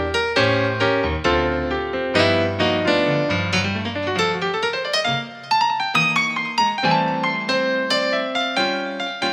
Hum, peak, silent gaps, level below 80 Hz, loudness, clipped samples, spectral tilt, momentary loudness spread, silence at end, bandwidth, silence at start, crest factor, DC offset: none; -2 dBFS; none; -42 dBFS; -20 LUFS; under 0.1%; -4.5 dB/octave; 5 LU; 0 s; 13.5 kHz; 0 s; 18 dB; under 0.1%